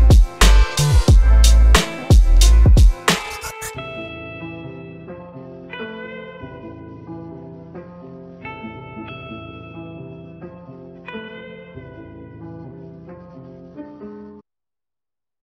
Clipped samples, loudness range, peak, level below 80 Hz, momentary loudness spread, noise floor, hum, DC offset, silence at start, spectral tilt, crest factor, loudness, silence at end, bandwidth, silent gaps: under 0.1%; 22 LU; 0 dBFS; -18 dBFS; 25 LU; under -90 dBFS; none; under 0.1%; 0 s; -4.5 dB/octave; 16 dB; -15 LUFS; 1.5 s; 15 kHz; none